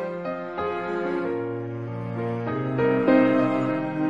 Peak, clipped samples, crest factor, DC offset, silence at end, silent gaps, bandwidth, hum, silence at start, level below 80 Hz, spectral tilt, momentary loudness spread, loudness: -8 dBFS; under 0.1%; 18 dB; under 0.1%; 0 s; none; 7.2 kHz; none; 0 s; -62 dBFS; -9 dB/octave; 12 LU; -25 LUFS